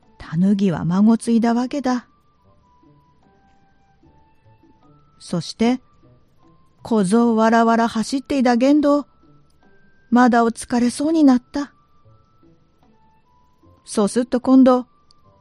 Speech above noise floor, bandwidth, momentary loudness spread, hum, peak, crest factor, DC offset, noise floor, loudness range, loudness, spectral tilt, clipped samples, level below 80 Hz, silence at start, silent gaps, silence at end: 39 dB; 11.5 kHz; 12 LU; none; -2 dBFS; 18 dB; under 0.1%; -56 dBFS; 10 LU; -18 LUFS; -6 dB/octave; under 0.1%; -54 dBFS; 0.2 s; none; 0.6 s